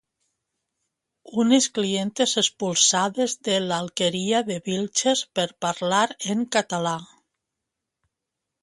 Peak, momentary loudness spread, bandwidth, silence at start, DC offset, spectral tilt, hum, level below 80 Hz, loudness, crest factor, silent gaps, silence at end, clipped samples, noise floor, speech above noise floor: -4 dBFS; 8 LU; 11.5 kHz; 1.25 s; under 0.1%; -3 dB/octave; none; -68 dBFS; -23 LUFS; 20 dB; none; 1.55 s; under 0.1%; -84 dBFS; 61 dB